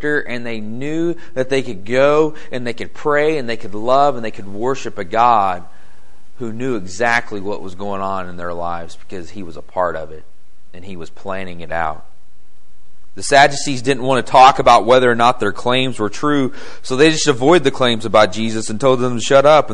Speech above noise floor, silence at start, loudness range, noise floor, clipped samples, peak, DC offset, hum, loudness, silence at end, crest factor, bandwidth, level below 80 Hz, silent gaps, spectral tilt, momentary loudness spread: 33 dB; 0 s; 13 LU; -49 dBFS; under 0.1%; 0 dBFS; 8%; none; -16 LUFS; 0 s; 18 dB; 11.5 kHz; -48 dBFS; none; -4.5 dB/octave; 17 LU